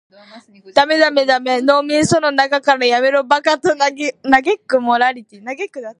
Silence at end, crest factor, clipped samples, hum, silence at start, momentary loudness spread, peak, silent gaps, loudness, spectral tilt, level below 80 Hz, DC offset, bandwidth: 0.1 s; 16 dB; under 0.1%; none; 0.35 s; 9 LU; 0 dBFS; none; -15 LUFS; -3.5 dB/octave; -54 dBFS; under 0.1%; 11 kHz